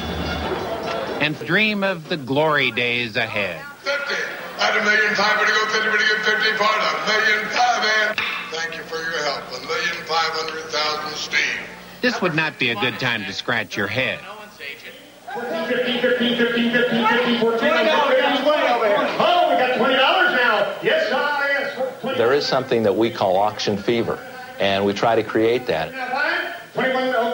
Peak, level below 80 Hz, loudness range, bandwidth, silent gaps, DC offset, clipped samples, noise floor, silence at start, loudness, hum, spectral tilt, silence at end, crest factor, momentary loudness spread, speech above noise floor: -4 dBFS; -50 dBFS; 5 LU; 16.5 kHz; none; under 0.1%; under 0.1%; -41 dBFS; 0 s; -19 LUFS; none; -4 dB/octave; 0 s; 16 dB; 9 LU; 20 dB